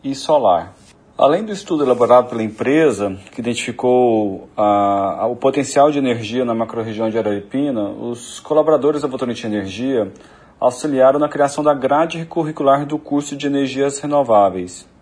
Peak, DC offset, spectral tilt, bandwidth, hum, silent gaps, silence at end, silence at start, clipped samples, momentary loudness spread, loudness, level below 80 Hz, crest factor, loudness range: 0 dBFS; under 0.1%; -5.5 dB/octave; 10.5 kHz; none; none; 0.2 s; 0.05 s; under 0.1%; 9 LU; -17 LUFS; -58 dBFS; 16 dB; 3 LU